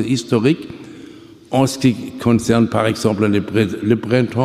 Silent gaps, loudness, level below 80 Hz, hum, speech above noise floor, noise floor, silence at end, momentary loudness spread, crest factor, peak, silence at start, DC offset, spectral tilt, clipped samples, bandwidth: none; -17 LUFS; -48 dBFS; none; 23 dB; -39 dBFS; 0 s; 10 LU; 16 dB; -2 dBFS; 0 s; under 0.1%; -6.5 dB/octave; under 0.1%; 15 kHz